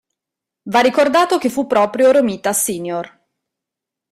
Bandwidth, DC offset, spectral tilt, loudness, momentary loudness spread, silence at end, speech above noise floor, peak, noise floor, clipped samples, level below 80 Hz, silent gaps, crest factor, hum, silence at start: 16 kHz; under 0.1%; -3.5 dB/octave; -15 LUFS; 11 LU; 1.05 s; 69 dB; -2 dBFS; -84 dBFS; under 0.1%; -60 dBFS; none; 16 dB; none; 0.65 s